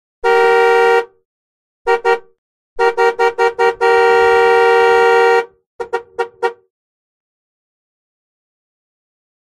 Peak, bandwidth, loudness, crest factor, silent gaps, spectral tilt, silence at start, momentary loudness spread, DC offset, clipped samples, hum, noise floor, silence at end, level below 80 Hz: 0 dBFS; 12.5 kHz; -13 LUFS; 14 dB; 1.25-1.85 s, 2.38-2.76 s, 5.66-5.79 s; -3 dB/octave; 0.25 s; 14 LU; under 0.1%; under 0.1%; none; under -90 dBFS; 2.95 s; -52 dBFS